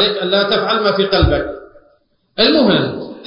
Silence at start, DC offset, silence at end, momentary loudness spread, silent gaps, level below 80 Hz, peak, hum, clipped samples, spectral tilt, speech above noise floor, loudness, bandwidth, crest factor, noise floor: 0 s; under 0.1%; 0 s; 13 LU; none; -30 dBFS; -2 dBFS; none; under 0.1%; -9.5 dB/octave; 42 dB; -14 LUFS; 5.6 kHz; 14 dB; -57 dBFS